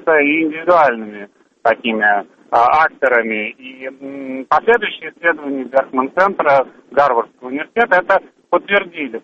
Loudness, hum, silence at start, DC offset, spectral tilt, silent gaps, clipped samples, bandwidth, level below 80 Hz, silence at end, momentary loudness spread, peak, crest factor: -15 LUFS; none; 0.05 s; under 0.1%; -6 dB/octave; none; under 0.1%; 7.4 kHz; -56 dBFS; 0.05 s; 14 LU; 0 dBFS; 16 dB